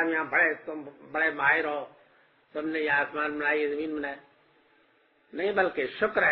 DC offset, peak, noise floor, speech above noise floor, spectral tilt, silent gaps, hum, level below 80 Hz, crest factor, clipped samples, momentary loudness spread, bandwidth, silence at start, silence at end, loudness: under 0.1%; -12 dBFS; -65 dBFS; 37 dB; -1.5 dB/octave; none; none; -68 dBFS; 18 dB; under 0.1%; 16 LU; 5.6 kHz; 0 s; 0 s; -27 LUFS